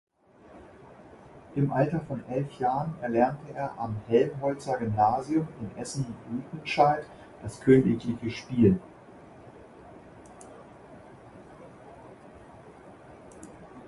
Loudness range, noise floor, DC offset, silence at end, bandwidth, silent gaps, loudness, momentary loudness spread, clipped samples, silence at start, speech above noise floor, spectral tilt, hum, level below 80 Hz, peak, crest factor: 23 LU; -54 dBFS; under 0.1%; 0 s; 11.5 kHz; none; -28 LUFS; 26 LU; under 0.1%; 0.55 s; 27 dB; -7.5 dB/octave; none; -56 dBFS; -8 dBFS; 22 dB